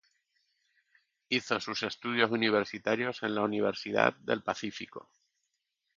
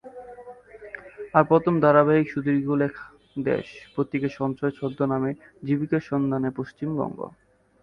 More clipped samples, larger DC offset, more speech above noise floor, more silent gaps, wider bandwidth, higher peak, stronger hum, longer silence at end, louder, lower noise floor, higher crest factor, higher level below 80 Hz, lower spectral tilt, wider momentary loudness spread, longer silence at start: neither; neither; first, 51 dB vs 21 dB; neither; first, 7.6 kHz vs 6.4 kHz; second, -6 dBFS vs -2 dBFS; neither; first, 0.95 s vs 0.55 s; second, -31 LUFS vs -24 LUFS; first, -82 dBFS vs -44 dBFS; about the same, 26 dB vs 22 dB; second, -74 dBFS vs -60 dBFS; second, -4.5 dB/octave vs -9.5 dB/octave; second, 9 LU vs 22 LU; first, 1.3 s vs 0.05 s